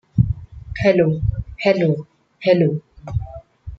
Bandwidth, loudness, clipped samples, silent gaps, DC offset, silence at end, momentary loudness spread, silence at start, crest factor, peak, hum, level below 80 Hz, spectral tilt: 7.4 kHz; -20 LUFS; under 0.1%; none; under 0.1%; 0.05 s; 14 LU; 0.15 s; 18 dB; -2 dBFS; none; -34 dBFS; -8.5 dB/octave